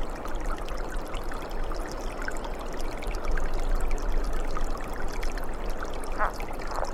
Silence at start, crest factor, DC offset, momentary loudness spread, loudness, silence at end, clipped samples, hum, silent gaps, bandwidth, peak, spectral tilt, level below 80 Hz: 0 s; 16 dB; under 0.1%; 5 LU; -35 LUFS; 0 s; under 0.1%; none; none; 13.5 kHz; -10 dBFS; -5 dB/octave; -30 dBFS